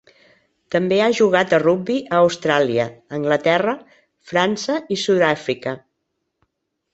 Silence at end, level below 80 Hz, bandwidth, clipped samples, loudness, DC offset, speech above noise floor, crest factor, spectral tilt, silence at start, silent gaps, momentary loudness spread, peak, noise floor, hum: 1.15 s; -62 dBFS; 8.2 kHz; under 0.1%; -19 LUFS; under 0.1%; 57 dB; 18 dB; -5 dB/octave; 0.7 s; none; 10 LU; -2 dBFS; -75 dBFS; none